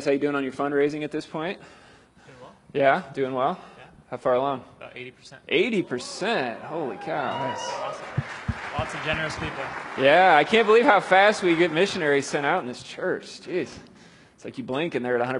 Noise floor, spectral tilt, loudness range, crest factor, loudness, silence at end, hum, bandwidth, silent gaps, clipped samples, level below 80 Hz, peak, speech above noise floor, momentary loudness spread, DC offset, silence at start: -52 dBFS; -5 dB/octave; 9 LU; 22 dB; -24 LUFS; 0 s; none; 11.5 kHz; none; under 0.1%; -54 dBFS; -2 dBFS; 28 dB; 16 LU; under 0.1%; 0 s